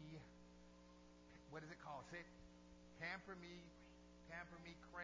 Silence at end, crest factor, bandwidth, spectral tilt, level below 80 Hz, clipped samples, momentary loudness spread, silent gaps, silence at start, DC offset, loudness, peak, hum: 0 s; 22 dB; 8 kHz; -5 dB/octave; -72 dBFS; under 0.1%; 15 LU; none; 0 s; under 0.1%; -58 LUFS; -36 dBFS; 60 Hz at -70 dBFS